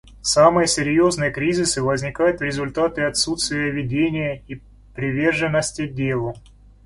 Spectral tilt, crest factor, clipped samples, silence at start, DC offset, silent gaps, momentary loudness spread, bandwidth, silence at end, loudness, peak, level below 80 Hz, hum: -4 dB/octave; 20 dB; under 0.1%; 0.05 s; under 0.1%; none; 12 LU; 11.5 kHz; 0.45 s; -20 LUFS; -2 dBFS; -46 dBFS; none